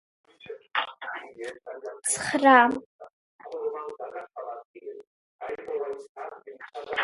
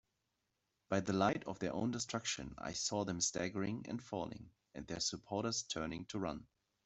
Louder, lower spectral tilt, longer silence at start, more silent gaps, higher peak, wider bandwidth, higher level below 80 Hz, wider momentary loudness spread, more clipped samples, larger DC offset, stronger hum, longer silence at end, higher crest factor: first, -26 LUFS vs -40 LUFS; second, -2 dB/octave vs -3.5 dB/octave; second, 0.45 s vs 0.9 s; first, 2.86-2.99 s, 3.13-3.39 s, 4.65-4.74 s, 5.07-5.39 s, 6.09-6.15 s vs none; first, -2 dBFS vs -18 dBFS; first, 12 kHz vs 8.2 kHz; second, -72 dBFS vs -66 dBFS; first, 24 LU vs 9 LU; neither; neither; neither; second, 0 s vs 0.4 s; about the same, 26 dB vs 24 dB